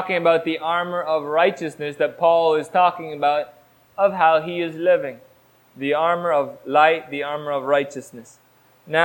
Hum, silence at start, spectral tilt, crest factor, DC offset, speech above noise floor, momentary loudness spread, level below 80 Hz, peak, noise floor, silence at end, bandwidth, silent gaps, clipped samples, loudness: none; 0 s; -5.5 dB/octave; 20 dB; under 0.1%; 25 dB; 12 LU; -70 dBFS; -2 dBFS; -45 dBFS; 0 s; 16.5 kHz; none; under 0.1%; -20 LUFS